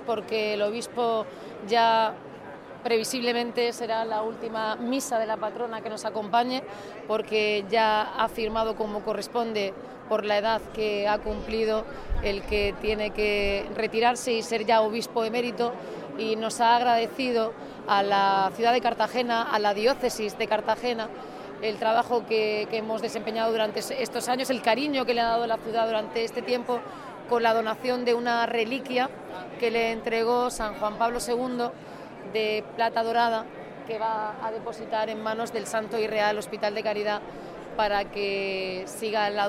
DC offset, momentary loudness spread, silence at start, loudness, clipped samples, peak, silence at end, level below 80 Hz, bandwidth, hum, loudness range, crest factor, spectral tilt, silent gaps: under 0.1%; 9 LU; 0 s; -27 LUFS; under 0.1%; -8 dBFS; 0 s; -48 dBFS; 16 kHz; none; 4 LU; 18 dB; -3.5 dB/octave; none